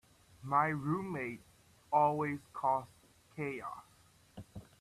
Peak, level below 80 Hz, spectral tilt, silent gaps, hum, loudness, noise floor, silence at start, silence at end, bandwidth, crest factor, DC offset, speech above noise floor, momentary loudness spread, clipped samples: -16 dBFS; -70 dBFS; -7.5 dB/octave; none; none; -35 LUFS; -63 dBFS; 0.4 s; 0.15 s; 14 kHz; 20 dB; under 0.1%; 28 dB; 23 LU; under 0.1%